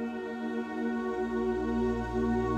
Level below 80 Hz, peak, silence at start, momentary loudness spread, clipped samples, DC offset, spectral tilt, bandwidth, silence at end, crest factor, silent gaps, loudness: -46 dBFS; -18 dBFS; 0 s; 5 LU; under 0.1%; under 0.1%; -7.5 dB/octave; 8.6 kHz; 0 s; 12 dB; none; -32 LUFS